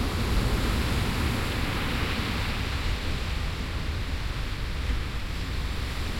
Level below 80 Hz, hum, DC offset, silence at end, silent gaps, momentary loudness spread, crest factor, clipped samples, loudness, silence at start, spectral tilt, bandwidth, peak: -30 dBFS; none; under 0.1%; 0 s; none; 5 LU; 14 dB; under 0.1%; -30 LUFS; 0 s; -5 dB/octave; 16.5 kHz; -14 dBFS